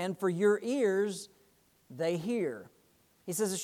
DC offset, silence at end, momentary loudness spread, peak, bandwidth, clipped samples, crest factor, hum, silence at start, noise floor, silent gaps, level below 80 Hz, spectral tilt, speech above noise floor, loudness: under 0.1%; 0 s; 19 LU; -16 dBFS; 17.5 kHz; under 0.1%; 18 dB; none; 0 s; -67 dBFS; none; -80 dBFS; -5 dB/octave; 36 dB; -32 LUFS